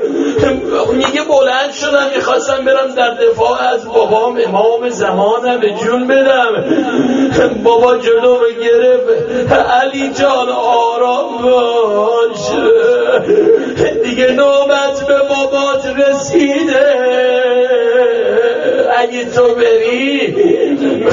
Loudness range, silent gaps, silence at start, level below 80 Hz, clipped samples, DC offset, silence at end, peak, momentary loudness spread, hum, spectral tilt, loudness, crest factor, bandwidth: 1 LU; none; 0 s; -46 dBFS; under 0.1%; under 0.1%; 0 s; 0 dBFS; 4 LU; none; -3 dB/octave; -11 LUFS; 10 dB; 7.6 kHz